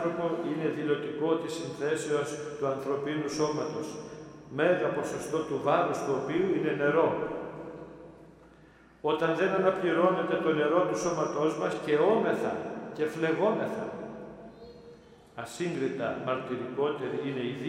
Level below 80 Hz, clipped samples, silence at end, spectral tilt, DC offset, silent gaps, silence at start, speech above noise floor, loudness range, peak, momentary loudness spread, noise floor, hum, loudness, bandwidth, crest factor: -66 dBFS; under 0.1%; 0 s; -5.5 dB/octave; under 0.1%; none; 0 s; 27 dB; 6 LU; -12 dBFS; 16 LU; -56 dBFS; none; -30 LUFS; 13.5 kHz; 18 dB